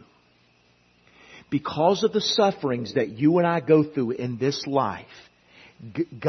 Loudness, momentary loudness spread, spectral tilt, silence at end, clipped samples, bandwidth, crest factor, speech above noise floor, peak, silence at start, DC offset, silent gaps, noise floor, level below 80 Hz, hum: -23 LUFS; 10 LU; -6 dB/octave; 0 s; under 0.1%; 6.4 kHz; 20 dB; 38 dB; -6 dBFS; 1.3 s; under 0.1%; none; -61 dBFS; -66 dBFS; 60 Hz at -50 dBFS